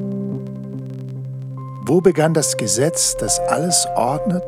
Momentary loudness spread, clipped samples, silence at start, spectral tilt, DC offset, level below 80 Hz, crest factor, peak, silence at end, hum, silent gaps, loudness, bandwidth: 14 LU; under 0.1%; 0 s; -4 dB/octave; under 0.1%; -46 dBFS; 18 dB; -2 dBFS; 0 s; none; none; -17 LUFS; 16.5 kHz